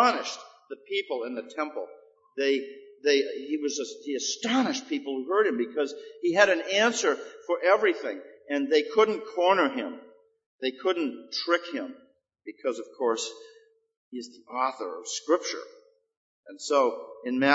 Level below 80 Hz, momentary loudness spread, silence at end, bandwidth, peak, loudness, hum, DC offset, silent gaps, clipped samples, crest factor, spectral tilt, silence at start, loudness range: -86 dBFS; 17 LU; 0 s; 8 kHz; -4 dBFS; -27 LUFS; none; under 0.1%; 10.46-10.59 s, 13.97-14.12 s, 16.17-16.43 s; under 0.1%; 24 dB; -2.5 dB/octave; 0 s; 8 LU